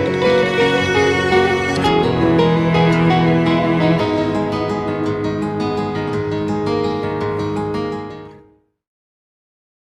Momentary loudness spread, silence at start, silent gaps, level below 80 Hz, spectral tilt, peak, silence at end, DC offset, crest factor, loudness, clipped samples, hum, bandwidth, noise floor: 7 LU; 0 s; none; -44 dBFS; -6.5 dB/octave; 0 dBFS; 1.5 s; under 0.1%; 16 dB; -17 LUFS; under 0.1%; none; 11 kHz; -51 dBFS